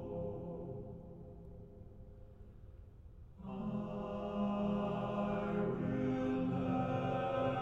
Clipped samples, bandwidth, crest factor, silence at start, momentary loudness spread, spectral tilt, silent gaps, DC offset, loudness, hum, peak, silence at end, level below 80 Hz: under 0.1%; 7.2 kHz; 14 dB; 0 s; 21 LU; -9 dB/octave; none; under 0.1%; -38 LUFS; none; -24 dBFS; 0 s; -58 dBFS